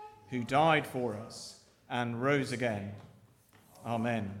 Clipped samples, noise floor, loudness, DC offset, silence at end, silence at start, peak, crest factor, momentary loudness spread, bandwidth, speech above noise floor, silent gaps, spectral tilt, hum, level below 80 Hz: under 0.1%; -62 dBFS; -32 LUFS; under 0.1%; 0 s; 0 s; -14 dBFS; 20 dB; 18 LU; 16.5 kHz; 30 dB; none; -5.5 dB/octave; none; -70 dBFS